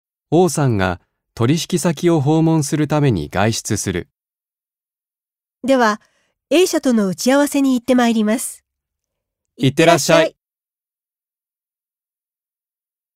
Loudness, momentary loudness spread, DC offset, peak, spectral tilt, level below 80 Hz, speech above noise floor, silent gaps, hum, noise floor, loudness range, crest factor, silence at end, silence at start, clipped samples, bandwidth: -16 LUFS; 7 LU; under 0.1%; 0 dBFS; -5 dB/octave; -50 dBFS; over 75 dB; none; none; under -90 dBFS; 5 LU; 18 dB; 2.85 s; 0.3 s; under 0.1%; 16 kHz